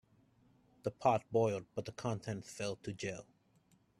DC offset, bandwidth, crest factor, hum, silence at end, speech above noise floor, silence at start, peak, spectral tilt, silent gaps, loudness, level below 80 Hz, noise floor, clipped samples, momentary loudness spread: under 0.1%; 13 kHz; 22 dB; none; 0.8 s; 34 dB; 0.85 s; -16 dBFS; -6 dB/octave; none; -38 LUFS; -72 dBFS; -71 dBFS; under 0.1%; 11 LU